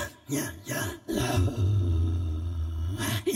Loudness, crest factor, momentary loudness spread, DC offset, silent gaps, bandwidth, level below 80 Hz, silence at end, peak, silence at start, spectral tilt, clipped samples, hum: -29 LUFS; 14 dB; 6 LU; under 0.1%; none; 16 kHz; -38 dBFS; 0 s; -14 dBFS; 0 s; -5.5 dB/octave; under 0.1%; none